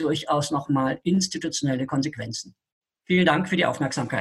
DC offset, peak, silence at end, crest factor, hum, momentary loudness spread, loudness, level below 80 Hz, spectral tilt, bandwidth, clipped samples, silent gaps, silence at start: under 0.1%; -6 dBFS; 0 s; 20 dB; none; 10 LU; -24 LUFS; -58 dBFS; -5 dB/octave; 12.5 kHz; under 0.1%; 2.72-2.82 s; 0 s